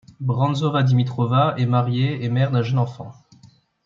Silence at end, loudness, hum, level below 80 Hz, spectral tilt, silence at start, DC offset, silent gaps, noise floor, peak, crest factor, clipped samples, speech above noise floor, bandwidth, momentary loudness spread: 0.4 s; -20 LUFS; none; -60 dBFS; -8 dB/octave; 0.2 s; under 0.1%; none; -52 dBFS; -6 dBFS; 16 dB; under 0.1%; 33 dB; 7 kHz; 7 LU